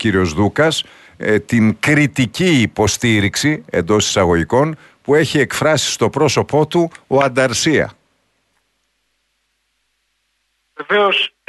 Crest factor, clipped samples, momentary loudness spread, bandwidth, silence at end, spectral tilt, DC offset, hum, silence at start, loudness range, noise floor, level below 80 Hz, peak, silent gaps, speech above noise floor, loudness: 16 dB; under 0.1%; 5 LU; 12.5 kHz; 0.2 s; -4.5 dB/octave; under 0.1%; none; 0 s; 7 LU; -67 dBFS; -44 dBFS; -2 dBFS; none; 52 dB; -15 LUFS